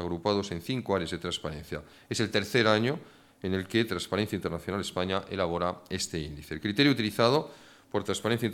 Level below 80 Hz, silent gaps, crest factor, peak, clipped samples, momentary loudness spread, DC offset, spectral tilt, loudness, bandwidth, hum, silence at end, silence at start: -56 dBFS; none; 22 dB; -8 dBFS; under 0.1%; 12 LU; under 0.1%; -5 dB/octave; -29 LUFS; 18 kHz; none; 0 s; 0 s